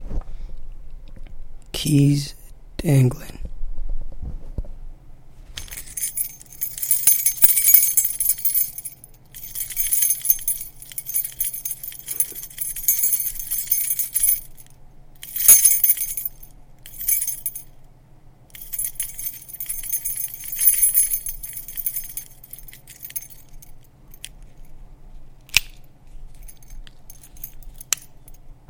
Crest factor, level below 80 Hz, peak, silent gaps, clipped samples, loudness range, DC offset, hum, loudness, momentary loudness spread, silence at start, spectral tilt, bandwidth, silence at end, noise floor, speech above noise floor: 24 dB; -38 dBFS; 0 dBFS; none; under 0.1%; 13 LU; under 0.1%; none; -18 LUFS; 24 LU; 0 s; -3 dB/octave; 17 kHz; 0.15 s; -47 dBFS; 29 dB